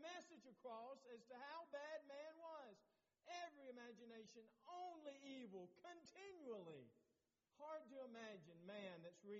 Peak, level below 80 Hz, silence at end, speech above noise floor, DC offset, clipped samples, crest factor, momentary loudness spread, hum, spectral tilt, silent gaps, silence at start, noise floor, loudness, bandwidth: -44 dBFS; under -90 dBFS; 0 s; 30 dB; under 0.1%; under 0.1%; 16 dB; 7 LU; none; -3 dB/octave; none; 0 s; -89 dBFS; -59 LUFS; 7.4 kHz